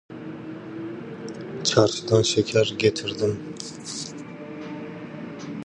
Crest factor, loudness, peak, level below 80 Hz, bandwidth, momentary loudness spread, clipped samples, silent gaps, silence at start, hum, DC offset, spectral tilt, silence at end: 22 dB; -25 LUFS; -4 dBFS; -58 dBFS; 11 kHz; 17 LU; under 0.1%; none; 0.1 s; none; under 0.1%; -4.5 dB/octave; 0 s